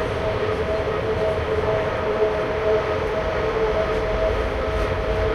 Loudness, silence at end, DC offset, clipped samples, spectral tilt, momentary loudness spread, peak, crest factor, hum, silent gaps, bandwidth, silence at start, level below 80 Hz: -22 LUFS; 0 s; under 0.1%; under 0.1%; -6.5 dB/octave; 2 LU; -10 dBFS; 12 dB; none; none; 12 kHz; 0 s; -32 dBFS